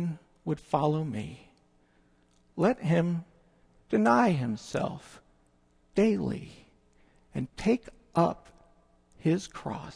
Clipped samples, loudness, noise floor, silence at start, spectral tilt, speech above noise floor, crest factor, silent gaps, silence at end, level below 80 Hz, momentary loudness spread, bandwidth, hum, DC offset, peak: under 0.1%; -29 LUFS; -65 dBFS; 0 s; -7.5 dB/octave; 37 dB; 20 dB; none; 0 s; -58 dBFS; 15 LU; 10.5 kHz; none; under 0.1%; -10 dBFS